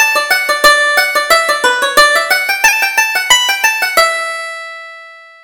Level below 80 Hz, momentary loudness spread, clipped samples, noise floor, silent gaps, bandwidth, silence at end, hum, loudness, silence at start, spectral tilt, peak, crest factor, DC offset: -44 dBFS; 13 LU; 0.2%; -35 dBFS; none; over 20 kHz; 0.25 s; none; -10 LUFS; 0 s; 1.5 dB/octave; 0 dBFS; 12 dB; under 0.1%